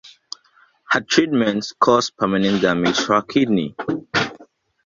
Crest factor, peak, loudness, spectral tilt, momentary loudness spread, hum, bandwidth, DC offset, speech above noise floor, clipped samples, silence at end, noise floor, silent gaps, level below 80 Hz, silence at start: 18 dB; -2 dBFS; -19 LUFS; -4.5 dB/octave; 11 LU; none; 7.6 kHz; under 0.1%; 38 dB; under 0.1%; 0.4 s; -56 dBFS; none; -56 dBFS; 0.05 s